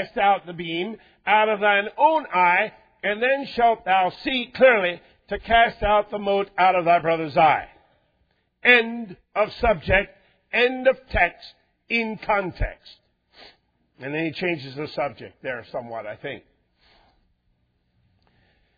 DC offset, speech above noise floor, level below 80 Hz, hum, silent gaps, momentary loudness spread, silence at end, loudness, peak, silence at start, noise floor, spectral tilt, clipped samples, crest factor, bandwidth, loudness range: under 0.1%; 47 dB; -42 dBFS; none; none; 15 LU; 2.4 s; -21 LUFS; -2 dBFS; 0 s; -68 dBFS; -7 dB/octave; under 0.1%; 22 dB; 5 kHz; 11 LU